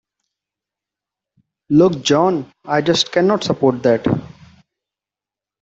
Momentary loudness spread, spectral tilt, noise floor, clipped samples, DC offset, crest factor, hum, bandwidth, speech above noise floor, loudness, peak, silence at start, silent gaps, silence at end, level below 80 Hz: 7 LU; -5.5 dB/octave; -89 dBFS; under 0.1%; under 0.1%; 16 dB; none; 8 kHz; 73 dB; -16 LUFS; -2 dBFS; 1.7 s; none; 1.35 s; -54 dBFS